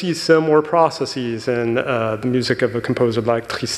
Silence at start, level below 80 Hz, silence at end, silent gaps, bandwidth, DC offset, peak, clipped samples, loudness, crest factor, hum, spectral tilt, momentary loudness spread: 0 s; -54 dBFS; 0 s; none; 13 kHz; under 0.1%; -2 dBFS; under 0.1%; -18 LUFS; 16 dB; none; -5.5 dB/octave; 7 LU